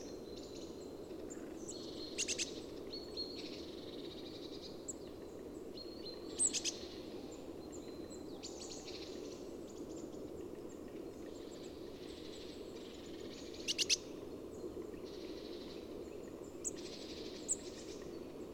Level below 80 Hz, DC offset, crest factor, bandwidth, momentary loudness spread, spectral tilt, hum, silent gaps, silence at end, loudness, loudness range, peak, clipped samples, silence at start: -66 dBFS; under 0.1%; 26 dB; 19 kHz; 12 LU; -2 dB/octave; none; none; 0 s; -44 LUFS; 7 LU; -20 dBFS; under 0.1%; 0 s